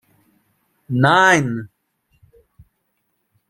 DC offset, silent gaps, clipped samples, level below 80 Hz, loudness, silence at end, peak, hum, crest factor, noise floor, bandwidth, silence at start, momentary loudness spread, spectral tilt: under 0.1%; none; under 0.1%; -60 dBFS; -16 LUFS; 1.85 s; -2 dBFS; none; 20 dB; -71 dBFS; 15.5 kHz; 0.9 s; 14 LU; -5 dB/octave